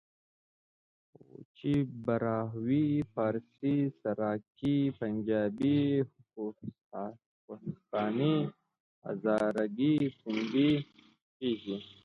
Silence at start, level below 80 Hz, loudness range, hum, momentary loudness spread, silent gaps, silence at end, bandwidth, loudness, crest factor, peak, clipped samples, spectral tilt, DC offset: 1.4 s; -68 dBFS; 3 LU; none; 13 LU; 1.45-1.55 s, 6.84-6.91 s, 7.26-7.48 s, 8.80-9.02 s, 11.22-11.40 s; 0.15 s; 6.6 kHz; -32 LUFS; 16 dB; -16 dBFS; under 0.1%; -8.5 dB/octave; under 0.1%